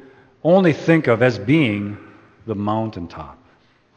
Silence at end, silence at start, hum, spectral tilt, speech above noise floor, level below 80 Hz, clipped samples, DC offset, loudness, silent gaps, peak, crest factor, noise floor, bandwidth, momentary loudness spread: 0.65 s; 0.45 s; none; -8 dB/octave; 38 dB; -54 dBFS; under 0.1%; under 0.1%; -18 LUFS; none; 0 dBFS; 20 dB; -56 dBFS; 8.6 kHz; 22 LU